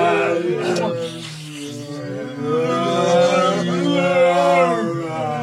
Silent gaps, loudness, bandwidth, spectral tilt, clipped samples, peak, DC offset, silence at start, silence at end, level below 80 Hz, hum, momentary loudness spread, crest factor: none; -18 LUFS; 12.5 kHz; -5.5 dB/octave; under 0.1%; -4 dBFS; under 0.1%; 0 s; 0 s; -64 dBFS; none; 15 LU; 14 dB